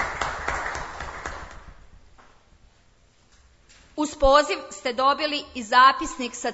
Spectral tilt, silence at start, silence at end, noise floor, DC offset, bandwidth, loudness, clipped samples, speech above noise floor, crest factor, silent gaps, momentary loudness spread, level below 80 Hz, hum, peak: -3 dB/octave; 0 s; 0 s; -58 dBFS; under 0.1%; 8 kHz; -23 LUFS; under 0.1%; 37 dB; 22 dB; none; 19 LU; -42 dBFS; none; -4 dBFS